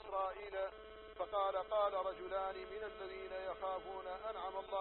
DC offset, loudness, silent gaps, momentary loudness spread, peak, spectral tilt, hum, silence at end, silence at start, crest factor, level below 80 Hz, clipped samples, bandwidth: under 0.1%; -42 LUFS; none; 10 LU; -26 dBFS; -1.5 dB/octave; none; 0 s; 0 s; 16 dB; -66 dBFS; under 0.1%; 4.2 kHz